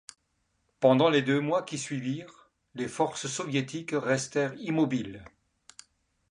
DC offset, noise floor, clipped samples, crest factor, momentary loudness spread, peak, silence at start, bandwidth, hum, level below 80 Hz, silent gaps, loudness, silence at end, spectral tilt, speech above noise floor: under 0.1%; -75 dBFS; under 0.1%; 20 dB; 14 LU; -8 dBFS; 0.8 s; 11 kHz; none; -68 dBFS; none; -28 LUFS; 1.05 s; -5 dB/octave; 47 dB